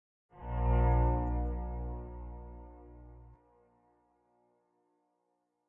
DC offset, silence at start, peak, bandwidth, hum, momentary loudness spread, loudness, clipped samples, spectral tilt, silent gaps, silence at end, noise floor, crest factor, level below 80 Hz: under 0.1%; 0.35 s; -18 dBFS; 3 kHz; 60 Hz at -55 dBFS; 26 LU; -33 LUFS; under 0.1%; -11.5 dB/octave; none; 2.4 s; -81 dBFS; 16 dB; -38 dBFS